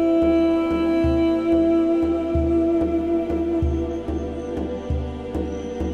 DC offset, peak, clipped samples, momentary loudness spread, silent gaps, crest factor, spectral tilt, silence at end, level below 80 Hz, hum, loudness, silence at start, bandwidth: under 0.1%; -10 dBFS; under 0.1%; 10 LU; none; 12 dB; -8.5 dB/octave; 0 s; -34 dBFS; none; -22 LUFS; 0 s; 6.6 kHz